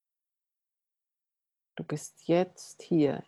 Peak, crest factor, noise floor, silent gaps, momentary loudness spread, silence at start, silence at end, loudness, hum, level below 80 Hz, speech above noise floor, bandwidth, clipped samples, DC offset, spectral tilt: -14 dBFS; 18 dB; -89 dBFS; none; 18 LU; 1.75 s; 0.05 s; -30 LUFS; none; -76 dBFS; 60 dB; 12.5 kHz; under 0.1%; under 0.1%; -6.5 dB/octave